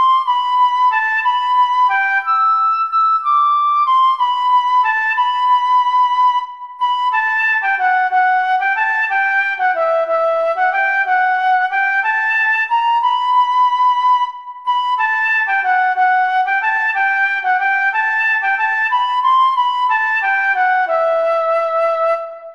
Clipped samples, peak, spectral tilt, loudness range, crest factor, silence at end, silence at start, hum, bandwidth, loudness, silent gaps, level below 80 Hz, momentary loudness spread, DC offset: under 0.1%; -4 dBFS; 0.5 dB/octave; 1 LU; 10 dB; 0 s; 0 s; none; 7.4 kHz; -14 LUFS; none; -68 dBFS; 3 LU; under 0.1%